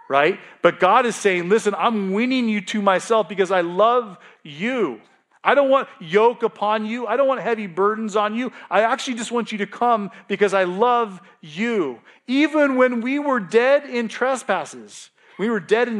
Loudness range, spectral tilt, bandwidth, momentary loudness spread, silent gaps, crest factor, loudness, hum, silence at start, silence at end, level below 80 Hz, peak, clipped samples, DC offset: 2 LU; -4.5 dB/octave; 12 kHz; 9 LU; none; 20 dB; -20 LUFS; none; 0.1 s; 0 s; -80 dBFS; 0 dBFS; under 0.1%; under 0.1%